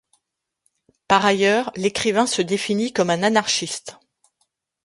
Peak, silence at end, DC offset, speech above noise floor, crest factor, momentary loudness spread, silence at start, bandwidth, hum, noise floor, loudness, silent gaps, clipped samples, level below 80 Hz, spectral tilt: -2 dBFS; 0.9 s; under 0.1%; 59 dB; 20 dB; 6 LU; 1.1 s; 11.5 kHz; none; -78 dBFS; -20 LUFS; none; under 0.1%; -60 dBFS; -3.5 dB/octave